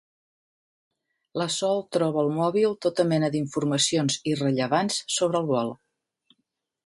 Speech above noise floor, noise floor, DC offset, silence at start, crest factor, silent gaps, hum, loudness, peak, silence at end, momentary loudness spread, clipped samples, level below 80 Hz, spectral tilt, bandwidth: 54 dB; -79 dBFS; under 0.1%; 1.35 s; 18 dB; none; none; -25 LUFS; -8 dBFS; 1.1 s; 5 LU; under 0.1%; -68 dBFS; -4.5 dB/octave; 11.5 kHz